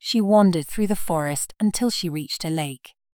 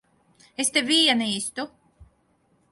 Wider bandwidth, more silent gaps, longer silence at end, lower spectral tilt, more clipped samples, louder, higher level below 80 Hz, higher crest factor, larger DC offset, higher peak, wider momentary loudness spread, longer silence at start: first, 19.5 kHz vs 12 kHz; neither; second, 0.4 s vs 0.65 s; first, -5 dB/octave vs -1.5 dB/octave; neither; about the same, -22 LUFS vs -21 LUFS; first, -48 dBFS vs -62 dBFS; about the same, 16 dB vs 20 dB; neither; about the same, -6 dBFS vs -6 dBFS; second, 10 LU vs 18 LU; second, 0.05 s vs 0.6 s